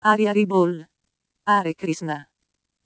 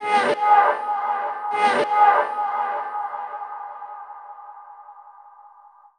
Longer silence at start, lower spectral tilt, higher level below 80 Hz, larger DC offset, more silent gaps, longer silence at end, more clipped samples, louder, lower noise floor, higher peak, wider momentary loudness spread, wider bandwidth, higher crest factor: about the same, 0.05 s vs 0 s; first, -6 dB/octave vs -3 dB/octave; about the same, -76 dBFS vs -80 dBFS; neither; neither; about the same, 0.6 s vs 0.5 s; neither; about the same, -22 LUFS vs -20 LUFS; first, -77 dBFS vs -50 dBFS; about the same, -2 dBFS vs -4 dBFS; second, 12 LU vs 23 LU; second, 8 kHz vs 10 kHz; about the same, 20 dB vs 18 dB